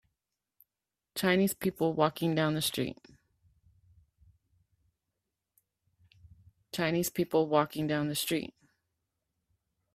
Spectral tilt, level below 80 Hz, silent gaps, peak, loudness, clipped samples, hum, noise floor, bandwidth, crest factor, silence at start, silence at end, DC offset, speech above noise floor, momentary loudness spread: -5 dB/octave; -68 dBFS; none; -10 dBFS; -30 LUFS; under 0.1%; none; -90 dBFS; 16 kHz; 24 dB; 1.15 s; 1.5 s; under 0.1%; 60 dB; 9 LU